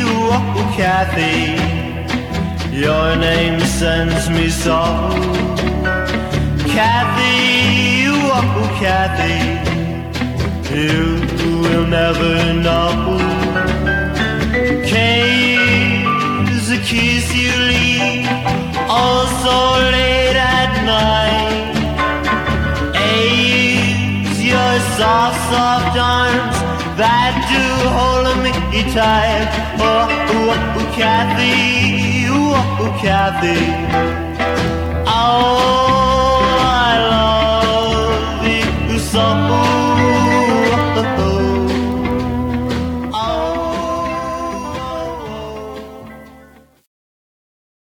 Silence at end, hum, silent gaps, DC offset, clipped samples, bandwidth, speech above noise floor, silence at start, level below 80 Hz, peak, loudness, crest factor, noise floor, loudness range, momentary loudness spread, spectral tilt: 1.6 s; none; none; under 0.1%; under 0.1%; 18 kHz; 30 dB; 0 s; -28 dBFS; 0 dBFS; -14 LUFS; 14 dB; -44 dBFS; 4 LU; 7 LU; -5 dB/octave